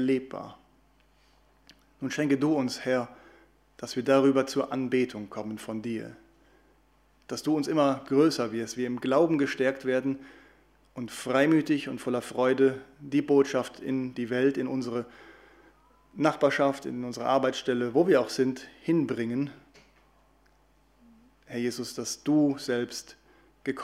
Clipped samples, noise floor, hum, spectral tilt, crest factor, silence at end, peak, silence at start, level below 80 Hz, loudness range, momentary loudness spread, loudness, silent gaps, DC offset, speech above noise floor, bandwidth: under 0.1%; -64 dBFS; none; -5.5 dB/octave; 20 dB; 0 s; -8 dBFS; 0 s; -66 dBFS; 6 LU; 14 LU; -28 LUFS; none; under 0.1%; 37 dB; 15 kHz